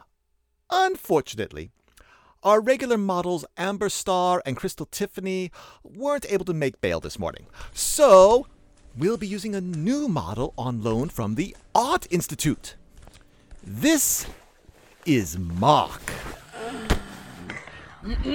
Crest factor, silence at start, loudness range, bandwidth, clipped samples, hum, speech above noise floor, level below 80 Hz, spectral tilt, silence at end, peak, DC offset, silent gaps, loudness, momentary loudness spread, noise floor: 22 dB; 0.7 s; 6 LU; over 20 kHz; under 0.1%; none; 47 dB; -42 dBFS; -4.5 dB/octave; 0 s; -4 dBFS; under 0.1%; none; -24 LUFS; 17 LU; -70 dBFS